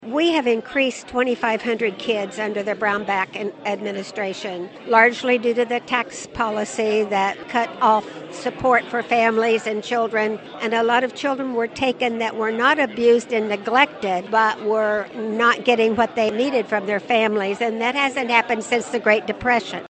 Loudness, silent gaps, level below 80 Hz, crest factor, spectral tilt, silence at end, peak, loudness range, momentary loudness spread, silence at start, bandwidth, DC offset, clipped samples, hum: -20 LUFS; none; -58 dBFS; 20 dB; -4 dB/octave; 0 s; 0 dBFS; 3 LU; 8 LU; 0 s; 8.8 kHz; under 0.1%; under 0.1%; none